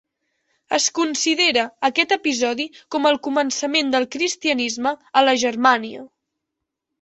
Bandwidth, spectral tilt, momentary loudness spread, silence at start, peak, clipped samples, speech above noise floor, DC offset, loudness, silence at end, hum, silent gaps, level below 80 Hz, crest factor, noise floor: 8.4 kHz; -1 dB/octave; 7 LU; 0.7 s; -2 dBFS; under 0.1%; 61 dB; under 0.1%; -19 LUFS; 0.95 s; none; none; -68 dBFS; 20 dB; -81 dBFS